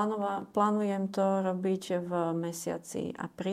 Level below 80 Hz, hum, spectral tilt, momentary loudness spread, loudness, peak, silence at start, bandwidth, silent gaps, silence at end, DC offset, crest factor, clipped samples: -74 dBFS; none; -6 dB/octave; 8 LU; -31 LUFS; -14 dBFS; 0 s; 15 kHz; none; 0 s; under 0.1%; 18 dB; under 0.1%